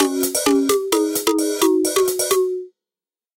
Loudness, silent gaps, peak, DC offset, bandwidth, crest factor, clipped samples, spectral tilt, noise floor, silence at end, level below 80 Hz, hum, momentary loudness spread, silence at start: -18 LUFS; none; -4 dBFS; under 0.1%; 17.5 kHz; 16 dB; under 0.1%; -1.5 dB/octave; under -90 dBFS; 0.7 s; -60 dBFS; none; 3 LU; 0 s